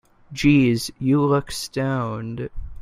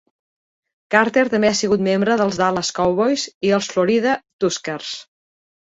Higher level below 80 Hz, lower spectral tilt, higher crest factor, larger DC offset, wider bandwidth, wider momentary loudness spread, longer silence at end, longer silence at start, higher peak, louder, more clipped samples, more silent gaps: first, -40 dBFS vs -56 dBFS; first, -6 dB/octave vs -4 dB/octave; about the same, 16 dB vs 18 dB; neither; first, 15.5 kHz vs 8 kHz; first, 15 LU vs 8 LU; second, 0 s vs 0.75 s; second, 0.3 s vs 0.9 s; about the same, -4 dBFS vs -2 dBFS; second, -21 LUFS vs -18 LUFS; neither; second, none vs 3.34-3.41 s, 4.33-4.39 s